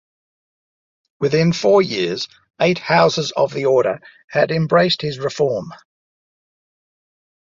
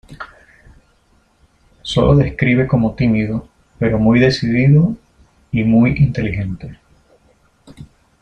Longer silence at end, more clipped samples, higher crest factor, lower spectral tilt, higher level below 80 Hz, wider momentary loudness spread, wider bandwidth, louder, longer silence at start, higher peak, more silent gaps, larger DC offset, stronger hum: first, 1.8 s vs 0.35 s; neither; about the same, 18 dB vs 16 dB; second, -5.5 dB/octave vs -8 dB/octave; second, -58 dBFS vs -36 dBFS; second, 10 LU vs 19 LU; second, 7.6 kHz vs 8.8 kHz; second, -18 LUFS vs -15 LUFS; first, 1.2 s vs 0.1 s; about the same, -2 dBFS vs -2 dBFS; first, 4.24-4.28 s vs none; neither; neither